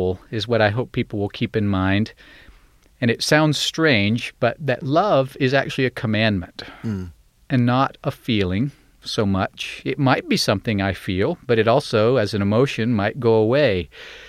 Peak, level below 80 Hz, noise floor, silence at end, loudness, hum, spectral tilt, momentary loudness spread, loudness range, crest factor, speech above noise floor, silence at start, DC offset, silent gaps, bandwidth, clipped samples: -2 dBFS; -50 dBFS; -52 dBFS; 0 s; -20 LUFS; none; -6 dB/octave; 10 LU; 4 LU; 18 dB; 32 dB; 0 s; under 0.1%; none; 15 kHz; under 0.1%